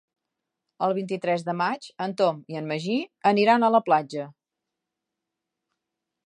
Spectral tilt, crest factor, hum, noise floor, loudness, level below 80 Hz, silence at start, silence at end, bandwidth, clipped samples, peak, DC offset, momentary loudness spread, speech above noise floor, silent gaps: -6 dB/octave; 20 dB; none; -85 dBFS; -24 LUFS; -80 dBFS; 0.8 s; 1.95 s; 10.5 kHz; under 0.1%; -6 dBFS; under 0.1%; 13 LU; 61 dB; none